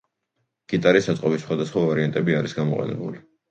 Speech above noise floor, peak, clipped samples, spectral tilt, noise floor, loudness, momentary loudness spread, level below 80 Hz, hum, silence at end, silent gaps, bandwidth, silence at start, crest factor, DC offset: 54 dB; -4 dBFS; under 0.1%; -6.5 dB/octave; -76 dBFS; -22 LUFS; 11 LU; -60 dBFS; none; 0.3 s; none; 8.6 kHz; 0.7 s; 20 dB; under 0.1%